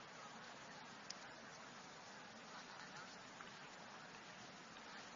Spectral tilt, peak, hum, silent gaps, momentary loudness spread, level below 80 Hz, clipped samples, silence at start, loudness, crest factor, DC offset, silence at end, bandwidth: -1.5 dB/octave; -32 dBFS; none; none; 3 LU; -86 dBFS; under 0.1%; 0 s; -55 LUFS; 24 dB; under 0.1%; 0 s; 7.2 kHz